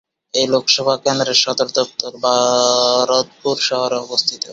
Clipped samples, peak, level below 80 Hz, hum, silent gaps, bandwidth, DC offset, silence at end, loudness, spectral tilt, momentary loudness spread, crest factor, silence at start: under 0.1%; 0 dBFS; -62 dBFS; none; none; 8 kHz; under 0.1%; 0 s; -16 LUFS; -2 dB/octave; 6 LU; 16 dB; 0.35 s